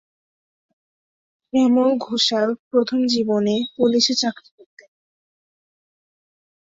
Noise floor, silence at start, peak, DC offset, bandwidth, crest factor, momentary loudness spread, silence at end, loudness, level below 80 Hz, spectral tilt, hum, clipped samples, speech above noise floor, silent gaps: under -90 dBFS; 1.55 s; -4 dBFS; under 0.1%; 7.8 kHz; 18 dB; 6 LU; 2.35 s; -19 LUFS; -66 dBFS; -4 dB/octave; none; under 0.1%; over 71 dB; 2.59-2.71 s